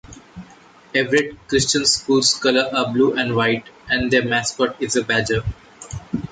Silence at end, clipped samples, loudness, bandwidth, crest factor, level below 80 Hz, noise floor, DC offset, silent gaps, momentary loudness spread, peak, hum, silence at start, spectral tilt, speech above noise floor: 0.05 s; under 0.1%; -19 LUFS; 9.6 kHz; 16 dB; -44 dBFS; -47 dBFS; under 0.1%; none; 12 LU; -4 dBFS; none; 0.1 s; -3.5 dB/octave; 28 dB